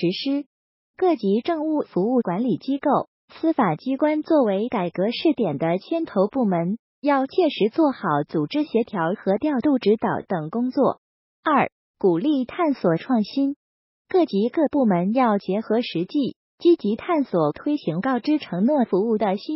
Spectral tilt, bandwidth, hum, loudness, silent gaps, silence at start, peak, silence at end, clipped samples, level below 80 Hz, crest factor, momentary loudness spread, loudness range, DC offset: -5.5 dB/octave; 5.8 kHz; none; -22 LUFS; 0.46-0.94 s, 3.08-3.28 s, 6.79-7.02 s, 10.98-11.43 s, 11.72-11.94 s, 13.56-14.05 s, 16.36-16.58 s; 0 s; -8 dBFS; 0 s; under 0.1%; -66 dBFS; 14 dB; 5 LU; 1 LU; under 0.1%